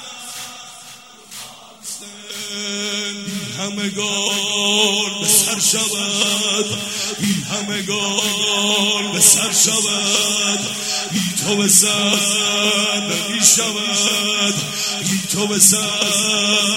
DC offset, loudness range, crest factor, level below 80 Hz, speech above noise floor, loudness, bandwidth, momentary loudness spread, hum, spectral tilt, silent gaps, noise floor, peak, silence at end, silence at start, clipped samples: under 0.1%; 9 LU; 18 dB; -62 dBFS; 23 dB; -15 LUFS; 16.5 kHz; 18 LU; none; -1 dB/octave; none; -40 dBFS; 0 dBFS; 0 s; 0 s; under 0.1%